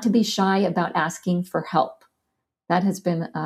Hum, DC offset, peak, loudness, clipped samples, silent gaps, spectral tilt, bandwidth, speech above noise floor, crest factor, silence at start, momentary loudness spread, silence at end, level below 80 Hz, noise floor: none; under 0.1%; -6 dBFS; -23 LUFS; under 0.1%; none; -5.5 dB/octave; 14.5 kHz; 57 dB; 18 dB; 0 s; 5 LU; 0 s; -68 dBFS; -79 dBFS